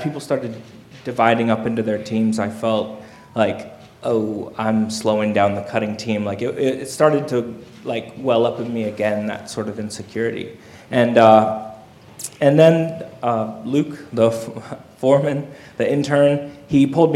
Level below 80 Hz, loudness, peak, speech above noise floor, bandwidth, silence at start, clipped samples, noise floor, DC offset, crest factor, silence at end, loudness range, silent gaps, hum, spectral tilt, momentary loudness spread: -60 dBFS; -19 LUFS; 0 dBFS; 22 dB; 14.5 kHz; 0 s; under 0.1%; -41 dBFS; under 0.1%; 20 dB; 0 s; 5 LU; none; none; -6.5 dB/octave; 16 LU